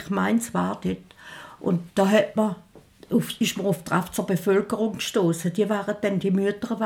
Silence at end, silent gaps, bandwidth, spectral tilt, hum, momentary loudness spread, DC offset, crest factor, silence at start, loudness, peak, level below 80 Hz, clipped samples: 0 s; none; 18 kHz; -5.5 dB/octave; none; 10 LU; under 0.1%; 18 dB; 0 s; -24 LUFS; -6 dBFS; -60 dBFS; under 0.1%